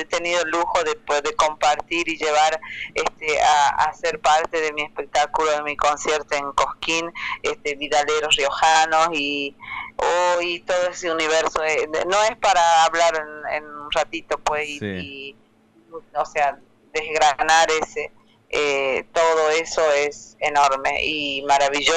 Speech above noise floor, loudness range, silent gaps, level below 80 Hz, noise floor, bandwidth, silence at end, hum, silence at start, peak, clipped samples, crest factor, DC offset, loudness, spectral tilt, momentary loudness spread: 34 dB; 3 LU; none; -50 dBFS; -54 dBFS; 10.5 kHz; 0 s; none; 0 s; -2 dBFS; under 0.1%; 18 dB; under 0.1%; -20 LUFS; -1.5 dB/octave; 11 LU